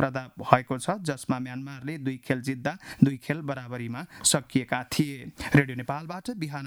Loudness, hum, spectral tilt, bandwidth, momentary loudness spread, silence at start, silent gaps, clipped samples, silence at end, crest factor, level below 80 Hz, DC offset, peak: -28 LUFS; none; -4.5 dB/octave; 18.5 kHz; 12 LU; 0 s; none; under 0.1%; 0 s; 28 dB; -58 dBFS; under 0.1%; 0 dBFS